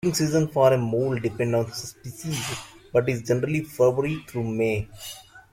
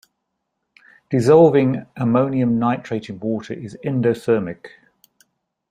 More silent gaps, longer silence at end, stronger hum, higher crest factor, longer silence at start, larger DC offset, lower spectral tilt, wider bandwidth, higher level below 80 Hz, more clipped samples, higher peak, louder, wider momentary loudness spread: neither; second, 0.1 s vs 1.05 s; neither; about the same, 20 dB vs 18 dB; second, 0.05 s vs 1.1 s; neither; second, -5.5 dB/octave vs -8 dB/octave; first, 16.5 kHz vs 11.5 kHz; about the same, -54 dBFS vs -58 dBFS; neither; second, -6 dBFS vs -2 dBFS; second, -24 LUFS vs -18 LUFS; about the same, 16 LU vs 16 LU